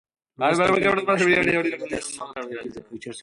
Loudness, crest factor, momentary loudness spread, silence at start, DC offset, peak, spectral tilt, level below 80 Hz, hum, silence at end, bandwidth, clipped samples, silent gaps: -21 LUFS; 18 dB; 17 LU; 0.4 s; under 0.1%; -6 dBFS; -4.5 dB/octave; -56 dBFS; none; 0 s; 11.5 kHz; under 0.1%; none